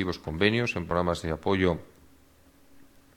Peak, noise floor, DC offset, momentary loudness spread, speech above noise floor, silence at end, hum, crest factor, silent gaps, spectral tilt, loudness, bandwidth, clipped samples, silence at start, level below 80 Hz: -6 dBFS; -58 dBFS; under 0.1%; 6 LU; 31 dB; 0.35 s; none; 24 dB; none; -6 dB/octave; -27 LUFS; 18 kHz; under 0.1%; 0 s; -48 dBFS